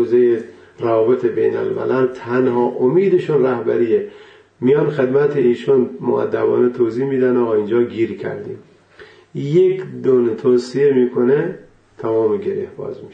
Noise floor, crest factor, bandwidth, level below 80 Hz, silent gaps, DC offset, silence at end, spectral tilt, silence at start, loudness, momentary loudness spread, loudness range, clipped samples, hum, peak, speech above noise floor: -44 dBFS; 12 dB; 7.8 kHz; -62 dBFS; none; under 0.1%; 0 s; -8.5 dB/octave; 0 s; -17 LUFS; 11 LU; 2 LU; under 0.1%; none; -4 dBFS; 28 dB